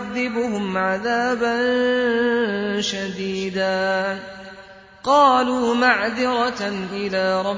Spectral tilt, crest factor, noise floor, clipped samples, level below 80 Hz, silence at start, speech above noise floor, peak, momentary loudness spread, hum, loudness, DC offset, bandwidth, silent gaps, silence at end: -4.5 dB/octave; 18 dB; -44 dBFS; under 0.1%; -56 dBFS; 0 s; 24 dB; -2 dBFS; 10 LU; none; -20 LUFS; under 0.1%; 7.8 kHz; none; 0 s